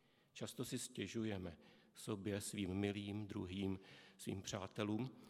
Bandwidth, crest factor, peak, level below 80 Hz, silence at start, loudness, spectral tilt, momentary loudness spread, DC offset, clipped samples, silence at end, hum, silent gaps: 15.5 kHz; 20 dB; -26 dBFS; -78 dBFS; 0.35 s; -46 LUFS; -5 dB/octave; 11 LU; under 0.1%; under 0.1%; 0 s; none; none